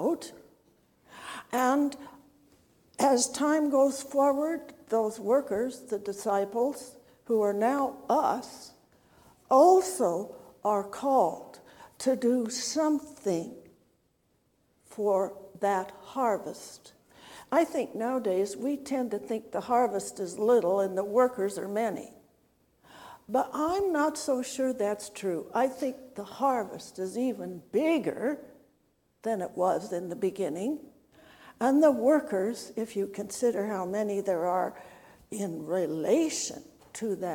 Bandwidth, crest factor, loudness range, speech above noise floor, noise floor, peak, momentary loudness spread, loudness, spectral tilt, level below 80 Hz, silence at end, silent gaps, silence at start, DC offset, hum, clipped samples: 18 kHz; 20 dB; 5 LU; 43 dB; -71 dBFS; -8 dBFS; 14 LU; -29 LUFS; -4.5 dB/octave; -72 dBFS; 0 s; none; 0 s; under 0.1%; none; under 0.1%